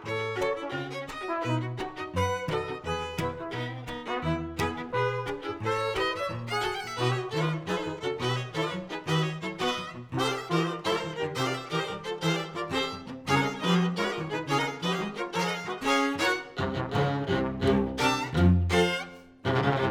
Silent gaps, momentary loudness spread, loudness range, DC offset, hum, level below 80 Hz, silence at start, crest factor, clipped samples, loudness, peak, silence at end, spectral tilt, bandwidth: none; 8 LU; 5 LU; under 0.1%; none; -50 dBFS; 0 s; 20 dB; under 0.1%; -29 LUFS; -10 dBFS; 0 s; -5.5 dB/octave; 17.5 kHz